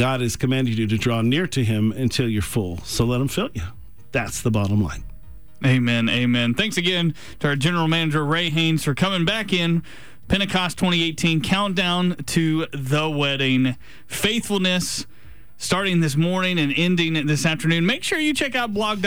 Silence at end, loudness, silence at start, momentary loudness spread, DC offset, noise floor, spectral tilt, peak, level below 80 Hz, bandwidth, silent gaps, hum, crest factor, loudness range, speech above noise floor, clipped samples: 0 s; -21 LUFS; 0 s; 6 LU; 1%; -43 dBFS; -5 dB/octave; -8 dBFS; -44 dBFS; over 20 kHz; none; none; 14 dB; 3 LU; 22 dB; under 0.1%